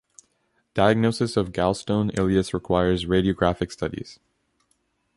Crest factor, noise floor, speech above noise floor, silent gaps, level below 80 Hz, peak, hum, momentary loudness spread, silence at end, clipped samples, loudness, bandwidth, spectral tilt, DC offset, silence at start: 20 dB; -70 dBFS; 48 dB; none; -44 dBFS; -4 dBFS; none; 10 LU; 1.05 s; under 0.1%; -23 LUFS; 11.5 kHz; -6.5 dB/octave; under 0.1%; 0.75 s